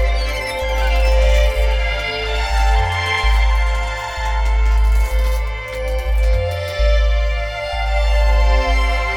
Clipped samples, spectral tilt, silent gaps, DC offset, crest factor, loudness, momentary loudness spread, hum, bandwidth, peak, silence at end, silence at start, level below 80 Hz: under 0.1%; -4.5 dB/octave; none; under 0.1%; 12 dB; -18 LUFS; 6 LU; none; 11.5 kHz; -4 dBFS; 0 s; 0 s; -16 dBFS